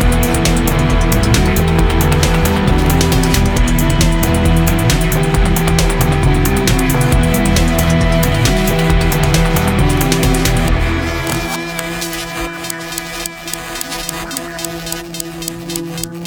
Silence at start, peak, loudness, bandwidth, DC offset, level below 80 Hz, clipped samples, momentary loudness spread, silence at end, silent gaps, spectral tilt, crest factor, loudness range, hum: 0 s; 0 dBFS; -14 LUFS; over 20 kHz; under 0.1%; -18 dBFS; under 0.1%; 9 LU; 0 s; none; -5 dB/octave; 14 dB; 8 LU; none